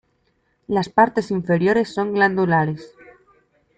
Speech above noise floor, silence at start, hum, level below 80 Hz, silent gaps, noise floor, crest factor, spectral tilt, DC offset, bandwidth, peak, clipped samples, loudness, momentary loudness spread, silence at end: 47 dB; 0.7 s; none; -58 dBFS; none; -66 dBFS; 18 dB; -7.5 dB/octave; under 0.1%; 9 kHz; -2 dBFS; under 0.1%; -19 LUFS; 7 LU; 0.9 s